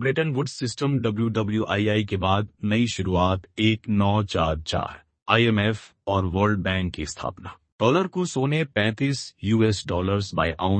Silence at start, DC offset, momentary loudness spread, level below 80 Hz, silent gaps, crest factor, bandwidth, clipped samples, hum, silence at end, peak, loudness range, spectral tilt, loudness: 0 s; under 0.1%; 7 LU; -46 dBFS; 5.22-5.26 s, 7.72-7.79 s; 20 dB; 8.8 kHz; under 0.1%; none; 0 s; -4 dBFS; 2 LU; -6 dB/octave; -24 LUFS